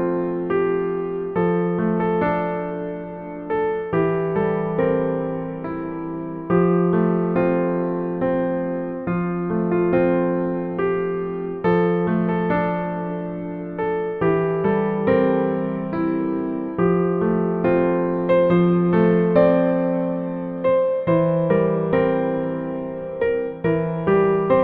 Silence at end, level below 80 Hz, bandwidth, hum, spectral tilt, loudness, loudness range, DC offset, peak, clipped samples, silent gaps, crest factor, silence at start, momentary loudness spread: 0 s; -50 dBFS; 4.3 kHz; none; -11.5 dB/octave; -21 LUFS; 4 LU; under 0.1%; -4 dBFS; under 0.1%; none; 16 dB; 0 s; 9 LU